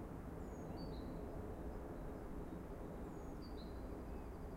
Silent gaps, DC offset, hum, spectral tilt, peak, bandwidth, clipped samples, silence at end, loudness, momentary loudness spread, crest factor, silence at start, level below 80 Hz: none; under 0.1%; none; -7.5 dB/octave; -36 dBFS; 16 kHz; under 0.1%; 0 s; -50 LUFS; 2 LU; 12 dB; 0 s; -54 dBFS